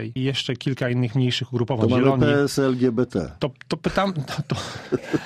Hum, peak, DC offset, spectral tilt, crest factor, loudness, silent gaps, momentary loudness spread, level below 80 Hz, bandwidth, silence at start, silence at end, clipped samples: none; -4 dBFS; under 0.1%; -6.5 dB/octave; 18 dB; -23 LUFS; none; 10 LU; -48 dBFS; 14 kHz; 0 s; 0 s; under 0.1%